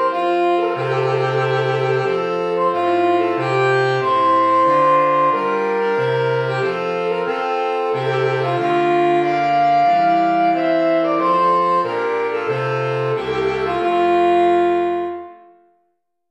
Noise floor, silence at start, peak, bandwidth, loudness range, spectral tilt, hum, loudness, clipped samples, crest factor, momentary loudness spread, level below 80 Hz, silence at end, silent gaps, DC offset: -69 dBFS; 0 s; -4 dBFS; 8.4 kHz; 3 LU; -7 dB/octave; none; -17 LUFS; under 0.1%; 12 dB; 6 LU; -58 dBFS; 0.95 s; none; under 0.1%